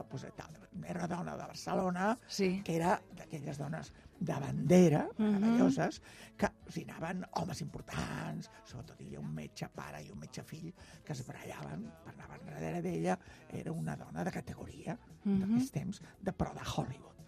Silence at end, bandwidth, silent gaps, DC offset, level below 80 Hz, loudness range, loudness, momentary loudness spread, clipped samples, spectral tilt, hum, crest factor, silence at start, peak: 0 s; 14.5 kHz; none; under 0.1%; -62 dBFS; 14 LU; -36 LUFS; 18 LU; under 0.1%; -6.5 dB/octave; none; 22 dB; 0 s; -14 dBFS